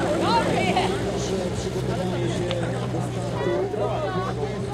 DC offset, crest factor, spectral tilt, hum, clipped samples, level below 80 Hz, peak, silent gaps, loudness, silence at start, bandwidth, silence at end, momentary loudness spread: under 0.1%; 16 dB; -6 dB/octave; none; under 0.1%; -42 dBFS; -8 dBFS; none; -25 LUFS; 0 s; 14 kHz; 0 s; 6 LU